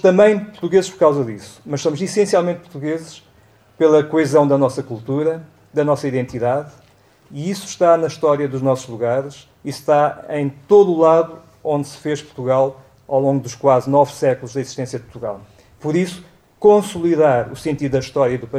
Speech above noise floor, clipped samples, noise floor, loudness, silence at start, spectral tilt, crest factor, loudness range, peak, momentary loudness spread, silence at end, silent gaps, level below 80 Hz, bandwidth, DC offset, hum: 35 dB; under 0.1%; -51 dBFS; -18 LUFS; 0.05 s; -6.5 dB/octave; 16 dB; 3 LU; -2 dBFS; 14 LU; 0 s; none; -56 dBFS; 14.5 kHz; under 0.1%; none